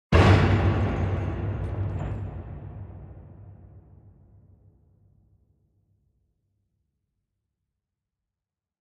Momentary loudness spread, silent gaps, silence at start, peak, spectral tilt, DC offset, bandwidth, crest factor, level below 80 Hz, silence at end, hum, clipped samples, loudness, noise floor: 27 LU; none; 0.1 s; -6 dBFS; -7.5 dB/octave; under 0.1%; 8.2 kHz; 22 dB; -38 dBFS; 5 s; none; under 0.1%; -24 LUFS; -89 dBFS